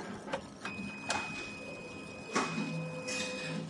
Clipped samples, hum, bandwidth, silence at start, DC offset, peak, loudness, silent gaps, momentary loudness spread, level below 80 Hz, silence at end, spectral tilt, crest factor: under 0.1%; none; 11.5 kHz; 0 s; under 0.1%; -18 dBFS; -38 LUFS; none; 9 LU; -68 dBFS; 0 s; -3.5 dB/octave; 22 dB